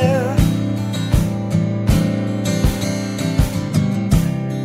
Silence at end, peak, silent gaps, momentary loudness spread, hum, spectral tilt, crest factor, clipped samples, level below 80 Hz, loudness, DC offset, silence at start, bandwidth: 0 s; -4 dBFS; none; 4 LU; none; -6.5 dB/octave; 14 dB; under 0.1%; -26 dBFS; -19 LUFS; under 0.1%; 0 s; 16 kHz